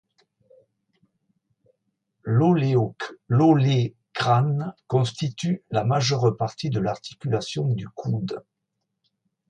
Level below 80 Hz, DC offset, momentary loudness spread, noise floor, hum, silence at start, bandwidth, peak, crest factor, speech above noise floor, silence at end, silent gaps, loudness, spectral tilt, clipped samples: -60 dBFS; under 0.1%; 10 LU; -80 dBFS; none; 2.25 s; 9.4 kHz; -6 dBFS; 18 dB; 57 dB; 1.1 s; none; -23 LUFS; -7 dB/octave; under 0.1%